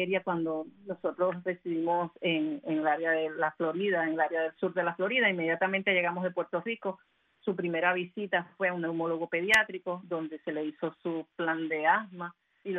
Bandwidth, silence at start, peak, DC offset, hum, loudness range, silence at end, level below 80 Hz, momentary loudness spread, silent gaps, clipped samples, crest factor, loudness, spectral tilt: 10.5 kHz; 0 s; -12 dBFS; under 0.1%; none; 2 LU; 0 s; -78 dBFS; 10 LU; none; under 0.1%; 20 dB; -30 LUFS; -5.5 dB/octave